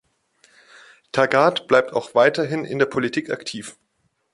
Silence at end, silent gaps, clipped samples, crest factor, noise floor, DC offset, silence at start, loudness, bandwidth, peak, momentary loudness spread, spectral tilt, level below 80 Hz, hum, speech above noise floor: 0.65 s; none; under 0.1%; 20 dB; -60 dBFS; under 0.1%; 1.15 s; -20 LUFS; 11.5 kHz; -2 dBFS; 12 LU; -5 dB/octave; -64 dBFS; none; 40 dB